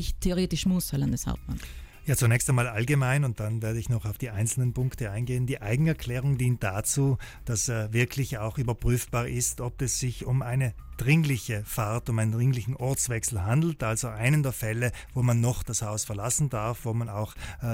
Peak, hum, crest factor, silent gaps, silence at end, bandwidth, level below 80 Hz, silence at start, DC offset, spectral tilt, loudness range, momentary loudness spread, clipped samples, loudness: -12 dBFS; none; 14 dB; none; 0 s; 16.5 kHz; -42 dBFS; 0 s; under 0.1%; -5 dB/octave; 2 LU; 7 LU; under 0.1%; -28 LUFS